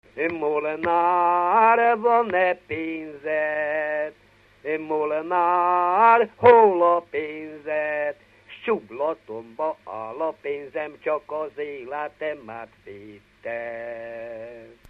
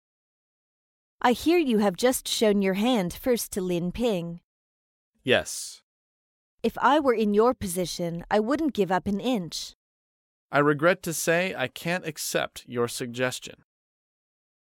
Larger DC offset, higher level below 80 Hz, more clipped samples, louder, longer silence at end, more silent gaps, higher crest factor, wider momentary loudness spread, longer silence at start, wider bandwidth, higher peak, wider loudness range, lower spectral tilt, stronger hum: neither; second, -66 dBFS vs -56 dBFS; neither; first, -22 LUFS vs -25 LUFS; second, 0.2 s vs 1.15 s; second, none vs 4.44-5.13 s, 5.83-6.58 s, 9.75-10.49 s; about the same, 20 dB vs 20 dB; first, 18 LU vs 10 LU; second, 0.15 s vs 1.25 s; second, 5 kHz vs 17 kHz; first, -2 dBFS vs -8 dBFS; first, 12 LU vs 4 LU; first, -7.5 dB/octave vs -4.5 dB/octave; neither